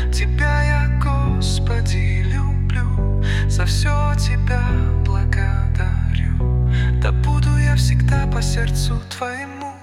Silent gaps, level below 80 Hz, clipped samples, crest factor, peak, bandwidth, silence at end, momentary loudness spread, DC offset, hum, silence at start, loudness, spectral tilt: none; -20 dBFS; under 0.1%; 10 dB; -6 dBFS; 13 kHz; 0.05 s; 4 LU; under 0.1%; none; 0 s; -19 LUFS; -6 dB/octave